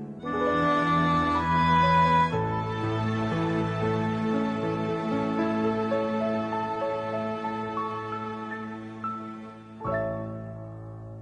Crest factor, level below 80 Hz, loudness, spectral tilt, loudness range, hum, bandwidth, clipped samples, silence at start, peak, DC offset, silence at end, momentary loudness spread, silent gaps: 16 dB; -50 dBFS; -27 LUFS; -7.5 dB/octave; 9 LU; none; 9.8 kHz; under 0.1%; 0 s; -12 dBFS; under 0.1%; 0 s; 15 LU; none